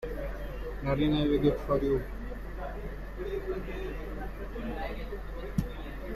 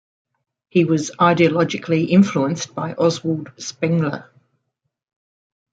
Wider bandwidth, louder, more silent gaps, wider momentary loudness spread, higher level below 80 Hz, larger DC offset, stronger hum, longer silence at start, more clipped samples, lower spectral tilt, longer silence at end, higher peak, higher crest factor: first, 14 kHz vs 8.8 kHz; second, -33 LUFS vs -19 LUFS; neither; first, 14 LU vs 10 LU; first, -38 dBFS vs -64 dBFS; neither; neither; second, 0 s vs 0.75 s; neither; first, -8 dB/octave vs -6 dB/octave; second, 0 s vs 1.5 s; second, -14 dBFS vs -2 dBFS; about the same, 18 dB vs 18 dB